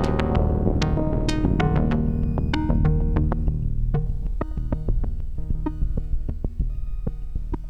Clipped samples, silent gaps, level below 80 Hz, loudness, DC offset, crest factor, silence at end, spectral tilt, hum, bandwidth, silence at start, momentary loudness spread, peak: under 0.1%; none; -24 dBFS; -25 LUFS; under 0.1%; 16 dB; 0 s; -8 dB/octave; none; 8.8 kHz; 0 s; 10 LU; -6 dBFS